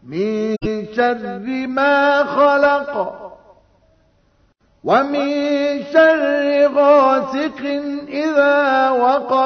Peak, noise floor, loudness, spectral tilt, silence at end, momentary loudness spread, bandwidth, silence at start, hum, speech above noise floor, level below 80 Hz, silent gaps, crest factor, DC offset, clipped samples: -2 dBFS; -58 dBFS; -16 LUFS; -5.5 dB/octave; 0 s; 11 LU; 6.4 kHz; 0.05 s; none; 43 dB; -50 dBFS; none; 16 dB; under 0.1%; under 0.1%